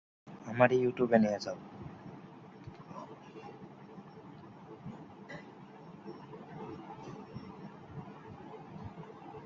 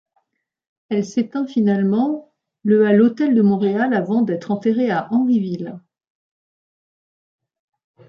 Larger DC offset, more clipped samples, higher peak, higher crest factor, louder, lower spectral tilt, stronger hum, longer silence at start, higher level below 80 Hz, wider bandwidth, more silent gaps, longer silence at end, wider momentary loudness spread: neither; neither; second, -10 dBFS vs -4 dBFS; first, 28 dB vs 16 dB; second, -33 LUFS vs -18 LUFS; second, -6 dB/octave vs -8 dB/octave; neither; second, 0.25 s vs 0.9 s; about the same, -70 dBFS vs -68 dBFS; about the same, 7.4 kHz vs 7 kHz; neither; second, 0 s vs 2.3 s; first, 23 LU vs 10 LU